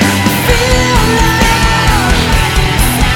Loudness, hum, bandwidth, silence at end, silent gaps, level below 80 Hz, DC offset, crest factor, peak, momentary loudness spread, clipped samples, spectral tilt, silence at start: -10 LUFS; none; 19 kHz; 0 s; none; -16 dBFS; under 0.1%; 10 dB; 0 dBFS; 2 LU; 0.2%; -4 dB/octave; 0 s